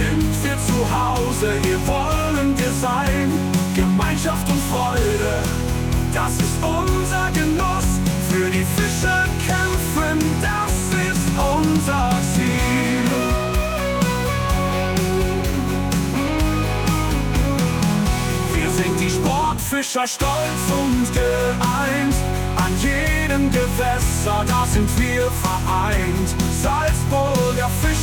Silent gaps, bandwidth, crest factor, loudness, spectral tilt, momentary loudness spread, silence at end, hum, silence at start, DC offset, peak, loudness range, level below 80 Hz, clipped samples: none; 19.5 kHz; 12 dB; -19 LUFS; -5 dB/octave; 2 LU; 0 s; none; 0 s; under 0.1%; -6 dBFS; 1 LU; -28 dBFS; under 0.1%